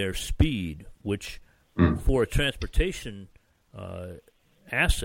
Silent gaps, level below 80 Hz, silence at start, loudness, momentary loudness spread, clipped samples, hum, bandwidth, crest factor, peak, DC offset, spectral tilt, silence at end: none; -32 dBFS; 0 s; -28 LUFS; 18 LU; under 0.1%; none; 16.5 kHz; 20 dB; -6 dBFS; under 0.1%; -5.5 dB/octave; 0 s